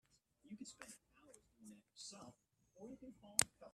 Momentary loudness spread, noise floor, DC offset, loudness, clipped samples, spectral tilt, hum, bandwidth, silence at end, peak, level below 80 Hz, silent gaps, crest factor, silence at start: 25 LU; -69 dBFS; under 0.1%; -44 LUFS; under 0.1%; -1 dB/octave; none; 14 kHz; 0.05 s; -12 dBFS; -80 dBFS; none; 40 dB; 0.45 s